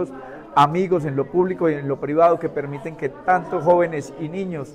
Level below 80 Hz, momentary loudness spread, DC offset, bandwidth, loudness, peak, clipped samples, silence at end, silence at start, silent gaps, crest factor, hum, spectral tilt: -56 dBFS; 12 LU; under 0.1%; 11 kHz; -21 LUFS; -4 dBFS; under 0.1%; 0 s; 0 s; none; 16 dB; none; -7.5 dB/octave